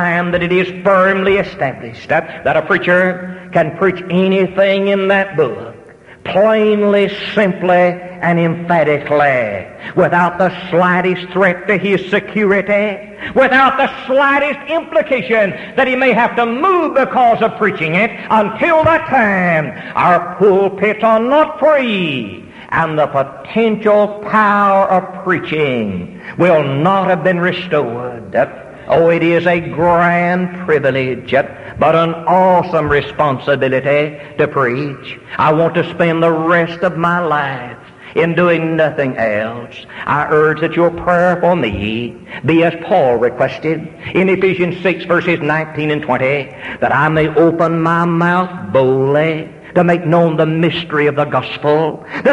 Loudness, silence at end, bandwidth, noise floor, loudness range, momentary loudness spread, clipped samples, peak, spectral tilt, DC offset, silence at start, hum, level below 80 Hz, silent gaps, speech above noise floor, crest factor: -14 LUFS; 0 s; 10.5 kHz; -39 dBFS; 2 LU; 8 LU; under 0.1%; 0 dBFS; -7.5 dB/octave; under 0.1%; 0 s; none; -46 dBFS; none; 25 dB; 12 dB